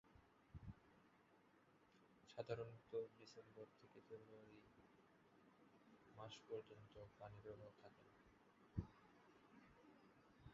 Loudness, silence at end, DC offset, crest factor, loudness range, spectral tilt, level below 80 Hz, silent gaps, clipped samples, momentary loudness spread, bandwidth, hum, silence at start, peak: -58 LUFS; 0 s; under 0.1%; 28 dB; 5 LU; -6 dB/octave; -74 dBFS; none; under 0.1%; 16 LU; 7.2 kHz; none; 0.05 s; -32 dBFS